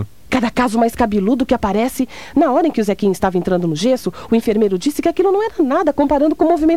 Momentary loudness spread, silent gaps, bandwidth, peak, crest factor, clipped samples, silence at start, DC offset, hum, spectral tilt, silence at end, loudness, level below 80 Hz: 4 LU; none; 16 kHz; -2 dBFS; 14 dB; under 0.1%; 0 s; 1%; none; -6 dB/octave; 0 s; -16 LUFS; -40 dBFS